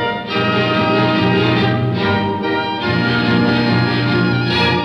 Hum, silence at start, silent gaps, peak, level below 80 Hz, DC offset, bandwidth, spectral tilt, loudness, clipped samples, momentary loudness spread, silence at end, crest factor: none; 0 s; none; -4 dBFS; -46 dBFS; under 0.1%; 6.8 kHz; -7.5 dB/octave; -15 LUFS; under 0.1%; 4 LU; 0 s; 12 dB